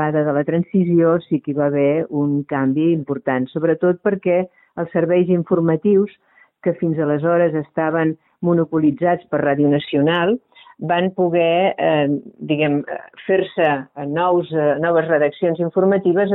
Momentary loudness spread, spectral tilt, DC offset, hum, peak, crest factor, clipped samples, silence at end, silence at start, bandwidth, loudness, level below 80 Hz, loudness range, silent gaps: 7 LU; -11 dB/octave; under 0.1%; none; -4 dBFS; 14 dB; under 0.1%; 0 s; 0 s; 4.1 kHz; -18 LUFS; -60 dBFS; 1 LU; none